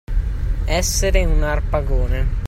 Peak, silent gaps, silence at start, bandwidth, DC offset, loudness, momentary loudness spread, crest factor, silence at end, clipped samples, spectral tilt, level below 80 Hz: -2 dBFS; none; 0.1 s; 15.5 kHz; under 0.1%; -21 LUFS; 7 LU; 16 dB; 0 s; under 0.1%; -4.5 dB/octave; -18 dBFS